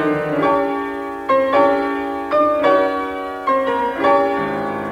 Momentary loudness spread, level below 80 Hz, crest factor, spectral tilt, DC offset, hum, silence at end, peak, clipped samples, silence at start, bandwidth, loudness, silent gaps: 8 LU; -50 dBFS; 14 dB; -6.5 dB/octave; under 0.1%; none; 0 s; -4 dBFS; under 0.1%; 0 s; 13.5 kHz; -18 LUFS; none